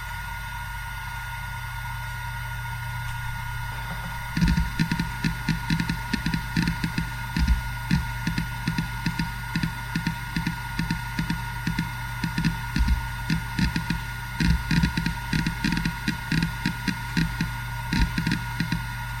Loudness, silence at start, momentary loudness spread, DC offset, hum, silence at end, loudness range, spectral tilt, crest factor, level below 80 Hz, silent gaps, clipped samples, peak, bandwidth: -28 LUFS; 0 s; 7 LU; under 0.1%; none; 0 s; 4 LU; -5 dB/octave; 18 dB; -34 dBFS; none; under 0.1%; -8 dBFS; 16.5 kHz